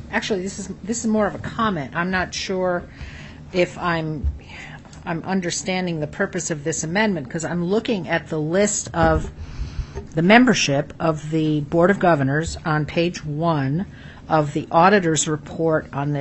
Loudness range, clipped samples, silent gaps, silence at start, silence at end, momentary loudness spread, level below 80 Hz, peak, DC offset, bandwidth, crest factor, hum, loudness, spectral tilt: 6 LU; under 0.1%; none; 0 s; 0 s; 15 LU; -40 dBFS; 0 dBFS; under 0.1%; 8.4 kHz; 20 dB; none; -21 LUFS; -5 dB/octave